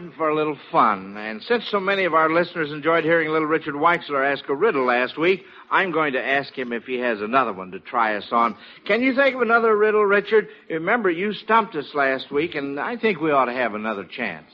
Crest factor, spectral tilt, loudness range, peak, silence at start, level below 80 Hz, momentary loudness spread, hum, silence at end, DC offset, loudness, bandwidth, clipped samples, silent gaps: 18 dB; -2.5 dB/octave; 3 LU; -4 dBFS; 0 s; -68 dBFS; 9 LU; none; 0.1 s; under 0.1%; -21 LUFS; 6 kHz; under 0.1%; none